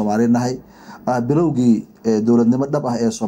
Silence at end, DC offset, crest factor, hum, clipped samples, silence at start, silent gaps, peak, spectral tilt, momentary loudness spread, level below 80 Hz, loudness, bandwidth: 0 s; under 0.1%; 12 dB; none; under 0.1%; 0 s; none; -4 dBFS; -7 dB/octave; 8 LU; -54 dBFS; -18 LUFS; 9.4 kHz